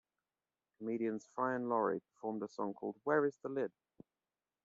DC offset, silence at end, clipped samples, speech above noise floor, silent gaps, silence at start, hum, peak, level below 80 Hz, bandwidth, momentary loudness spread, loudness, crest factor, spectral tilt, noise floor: under 0.1%; 0.95 s; under 0.1%; over 52 dB; none; 0.8 s; none; -20 dBFS; -86 dBFS; 7.6 kHz; 8 LU; -39 LUFS; 20 dB; -6.5 dB/octave; under -90 dBFS